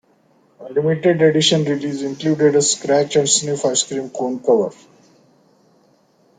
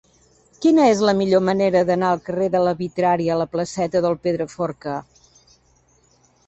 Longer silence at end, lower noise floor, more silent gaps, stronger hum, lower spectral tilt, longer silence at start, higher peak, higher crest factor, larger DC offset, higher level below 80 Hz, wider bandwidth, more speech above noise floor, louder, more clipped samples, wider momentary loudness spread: first, 1.65 s vs 1.45 s; about the same, -57 dBFS vs -59 dBFS; neither; neither; second, -3.5 dB/octave vs -6 dB/octave; about the same, 0.6 s vs 0.6 s; about the same, -2 dBFS vs -4 dBFS; about the same, 18 dB vs 16 dB; neither; second, -62 dBFS vs -56 dBFS; first, 9.6 kHz vs 8.2 kHz; about the same, 40 dB vs 40 dB; first, -17 LUFS vs -20 LUFS; neither; about the same, 9 LU vs 10 LU